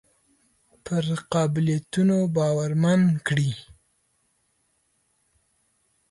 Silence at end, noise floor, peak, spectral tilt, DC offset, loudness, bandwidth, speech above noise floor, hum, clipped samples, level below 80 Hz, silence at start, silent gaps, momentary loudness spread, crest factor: 2.5 s; -70 dBFS; -10 dBFS; -6.5 dB/octave; under 0.1%; -23 LUFS; 11.5 kHz; 48 dB; none; under 0.1%; -62 dBFS; 0.85 s; none; 8 LU; 16 dB